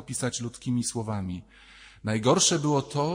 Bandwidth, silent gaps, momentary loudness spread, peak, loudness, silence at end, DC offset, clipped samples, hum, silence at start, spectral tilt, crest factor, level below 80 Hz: 16 kHz; none; 14 LU; -8 dBFS; -26 LUFS; 0 s; under 0.1%; under 0.1%; none; 0 s; -4 dB/octave; 20 dB; -60 dBFS